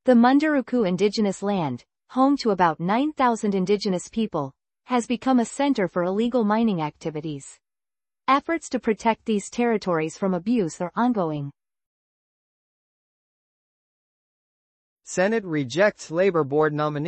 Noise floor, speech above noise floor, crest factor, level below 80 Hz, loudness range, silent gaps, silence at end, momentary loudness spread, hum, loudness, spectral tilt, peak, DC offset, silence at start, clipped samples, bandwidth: under -90 dBFS; over 68 dB; 18 dB; -62 dBFS; 7 LU; 11.86-14.97 s; 0 s; 10 LU; none; -23 LUFS; -6 dB/octave; -6 dBFS; under 0.1%; 0.05 s; under 0.1%; 8.8 kHz